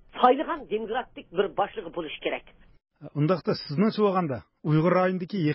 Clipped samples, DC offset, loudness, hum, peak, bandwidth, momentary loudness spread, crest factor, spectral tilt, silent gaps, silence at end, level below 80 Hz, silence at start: under 0.1%; under 0.1%; -27 LUFS; none; -4 dBFS; 5.8 kHz; 11 LU; 22 dB; -11 dB/octave; none; 0 s; -60 dBFS; 0.15 s